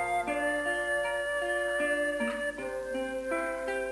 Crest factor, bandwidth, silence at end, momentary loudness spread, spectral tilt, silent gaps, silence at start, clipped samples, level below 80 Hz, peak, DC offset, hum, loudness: 12 dB; 11 kHz; 0 s; 5 LU; -3 dB/octave; none; 0 s; under 0.1%; -56 dBFS; -20 dBFS; under 0.1%; none; -31 LUFS